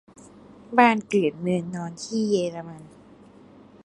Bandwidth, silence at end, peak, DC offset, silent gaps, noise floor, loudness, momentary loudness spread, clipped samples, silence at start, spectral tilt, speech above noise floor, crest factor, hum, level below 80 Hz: 11 kHz; 1 s; -2 dBFS; under 0.1%; none; -50 dBFS; -23 LUFS; 18 LU; under 0.1%; 0.5 s; -5.5 dB/octave; 27 dB; 24 dB; none; -66 dBFS